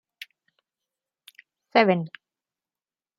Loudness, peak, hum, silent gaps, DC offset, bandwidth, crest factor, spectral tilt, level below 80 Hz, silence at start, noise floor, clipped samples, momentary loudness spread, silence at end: -22 LUFS; -4 dBFS; none; none; under 0.1%; 15.5 kHz; 26 dB; -7 dB/octave; -78 dBFS; 1.75 s; under -90 dBFS; under 0.1%; 24 LU; 1.1 s